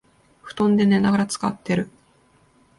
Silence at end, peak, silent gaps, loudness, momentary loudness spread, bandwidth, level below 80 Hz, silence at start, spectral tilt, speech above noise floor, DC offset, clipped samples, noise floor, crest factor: 0.9 s; -8 dBFS; none; -21 LUFS; 12 LU; 11.5 kHz; -56 dBFS; 0.45 s; -6 dB/octave; 39 dB; under 0.1%; under 0.1%; -58 dBFS; 14 dB